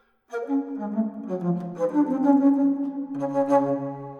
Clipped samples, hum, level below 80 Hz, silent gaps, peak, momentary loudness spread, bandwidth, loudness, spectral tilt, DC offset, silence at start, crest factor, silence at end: under 0.1%; none; -76 dBFS; none; -6 dBFS; 10 LU; 6.8 kHz; -24 LUFS; -9.5 dB/octave; under 0.1%; 0.3 s; 18 dB; 0 s